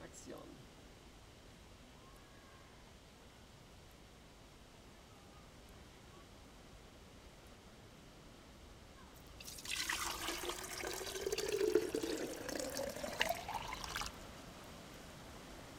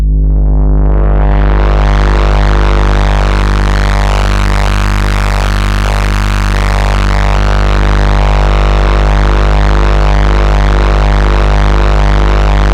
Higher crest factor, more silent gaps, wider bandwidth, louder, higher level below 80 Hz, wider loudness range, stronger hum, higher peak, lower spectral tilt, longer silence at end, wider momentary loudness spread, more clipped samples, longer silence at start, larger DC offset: first, 32 dB vs 6 dB; neither; first, 17.5 kHz vs 9.4 kHz; second, -42 LUFS vs -11 LUFS; second, -62 dBFS vs -8 dBFS; first, 19 LU vs 2 LU; second, none vs 50 Hz at -10 dBFS; second, -16 dBFS vs 0 dBFS; second, -2.5 dB/octave vs -6 dB/octave; about the same, 0 s vs 0 s; first, 21 LU vs 2 LU; neither; about the same, 0 s vs 0 s; neither